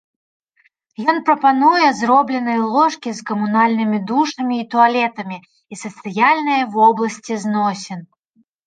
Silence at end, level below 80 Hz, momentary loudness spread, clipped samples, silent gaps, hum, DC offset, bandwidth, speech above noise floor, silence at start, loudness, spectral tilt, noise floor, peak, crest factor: 0.6 s; -70 dBFS; 16 LU; under 0.1%; none; none; under 0.1%; 9.4 kHz; 45 dB; 1 s; -16 LUFS; -5 dB/octave; -61 dBFS; -2 dBFS; 16 dB